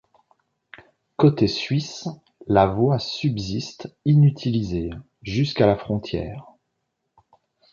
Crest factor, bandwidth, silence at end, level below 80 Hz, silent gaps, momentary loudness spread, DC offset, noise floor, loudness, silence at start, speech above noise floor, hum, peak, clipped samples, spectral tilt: 20 dB; 7.2 kHz; 1.3 s; -46 dBFS; none; 17 LU; under 0.1%; -77 dBFS; -22 LUFS; 1.2 s; 56 dB; none; -2 dBFS; under 0.1%; -7 dB/octave